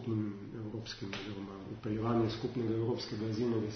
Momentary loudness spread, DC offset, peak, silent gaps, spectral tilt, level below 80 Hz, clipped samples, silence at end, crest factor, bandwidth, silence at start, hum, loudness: 10 LU; under 0.1%; -20 dBFS; none; -6.5 dB/octave; -62 dBFS; under 0.1%; 0 s; 16 dB; 6.4 kHz; 0 s; none; -37 LUFS